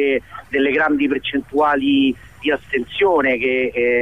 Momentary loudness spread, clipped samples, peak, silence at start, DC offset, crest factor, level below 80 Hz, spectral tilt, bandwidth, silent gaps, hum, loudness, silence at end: 7 LU; under 0.1%; -6 dBFS; 0 s; 0.3%; 12 dB; -50 dBFS; -6 dB/octave; 9.2 kHz; none; none; -18 LUFS; 0 s